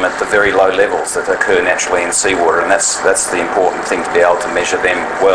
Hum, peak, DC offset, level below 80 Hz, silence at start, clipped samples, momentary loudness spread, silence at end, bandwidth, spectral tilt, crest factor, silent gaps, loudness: none; 0 dBFS; under 0.1%; -44 dBFS; 0 s; 0.1%; 3 LU; 0 s; 11 kHz; -2 dB/octave; 14 dB; none; -13 LUFS